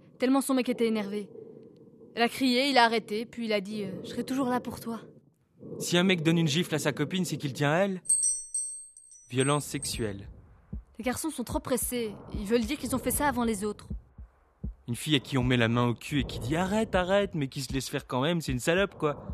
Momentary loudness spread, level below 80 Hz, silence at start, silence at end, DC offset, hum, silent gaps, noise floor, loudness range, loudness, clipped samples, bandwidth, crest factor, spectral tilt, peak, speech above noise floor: 14 LU; -48 dBFS; 0.2 s; 0 s; under 0.1%; none; none; -59 dBFS; 5 LU; -28 LUFS; under 0.1%; 14 kHz; 24 dB; -4 dB/octave; -6 dBFS; 31 dB